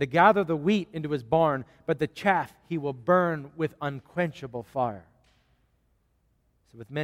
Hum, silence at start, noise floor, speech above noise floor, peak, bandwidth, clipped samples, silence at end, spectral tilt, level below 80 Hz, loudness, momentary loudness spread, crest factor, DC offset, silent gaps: none; 0 s; -69 dBFS; 43 dB; -6 dBFS; 15.5 kHz; under 0.1%; 0 s; -7 dB/octave; -62 dBFS; -27 LUFS; 12 LU; 22 dB; under 0.1%; none